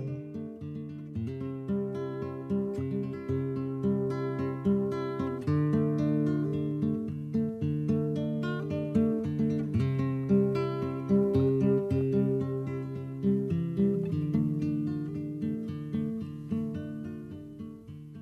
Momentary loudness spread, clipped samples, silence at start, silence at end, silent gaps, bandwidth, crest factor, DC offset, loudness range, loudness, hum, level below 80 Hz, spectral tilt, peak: 12 LU; under 0.1%; 0 s; 0 s; none; 8 kHz; 16 dB; under 0.1%; 6 LU; -31 LUFS; none; -58 dBFS; -10 dB/octave; -14 dBFS